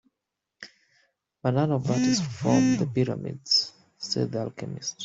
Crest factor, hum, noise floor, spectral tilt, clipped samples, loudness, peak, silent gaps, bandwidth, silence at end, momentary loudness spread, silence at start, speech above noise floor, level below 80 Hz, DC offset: 20 dB; none; -85 dBFS; -5 dB/octave; under 0.1%; -26 LUFS; -8 dBFS; none; 8 kHz; 0 s; 17 LU; 0.6 s; 60 dB; -62 dBFS; under 0.1%